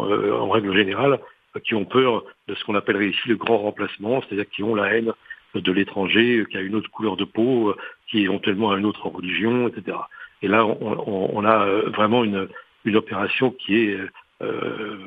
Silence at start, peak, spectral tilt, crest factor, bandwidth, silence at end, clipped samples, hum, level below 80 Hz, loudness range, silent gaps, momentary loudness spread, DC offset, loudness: 0 s; 0 dBFS; -8.5 dB/octave; 22 dB; 4.9 kHz; 0 s; under 0.1%; none; -66 dBFS; 2 LU; none; 11 LU; under 0.1%; -22 LUFS